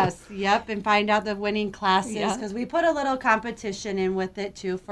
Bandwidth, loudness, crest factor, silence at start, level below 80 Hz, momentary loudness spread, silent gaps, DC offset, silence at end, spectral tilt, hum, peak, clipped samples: 11 kHz; -25 LUFS; 18 dB; 0 s; -54 dBFS; 9 LU; none; under 0.1%; 0 s; -4.5 dB/octave; none; -6 dBFS; under 0.1%